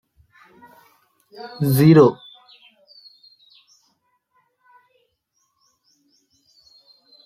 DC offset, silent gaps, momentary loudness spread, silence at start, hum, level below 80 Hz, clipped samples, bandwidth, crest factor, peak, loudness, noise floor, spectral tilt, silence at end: under 0.1%; none; 28 LU; 1.45 s; none; -60 dBFS; under 0.1%; 16 kHz; 22 dB; -2 dBFS; -15 LUFS; -71 dBFS; -7.5 dB/octave; 5.1 s